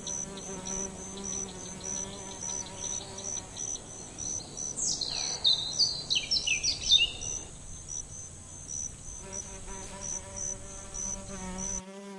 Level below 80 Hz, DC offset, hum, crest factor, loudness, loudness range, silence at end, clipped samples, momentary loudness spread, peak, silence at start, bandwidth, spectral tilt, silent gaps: -50 dBFS; under 0.1%; none; 24 dB; -31 LUFS; 11 LU; 0 s; under 0.1%; 15 LU; -10 dBFS; 0 s; 11.5 kHz; -0.5 dB/octave; none